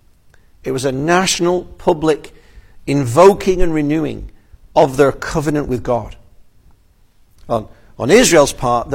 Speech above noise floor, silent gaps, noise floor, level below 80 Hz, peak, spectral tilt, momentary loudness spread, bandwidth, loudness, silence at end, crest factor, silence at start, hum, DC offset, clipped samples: 36 dB; none; -50 dBFS; -32 dBFS; 0 dBFS; -4.5 dB/octave; 13 LU; 16.5 kHz; -15 LUFS; 0 s; 16 dB; 0.65 s; none; under 0.1%; under 0.1%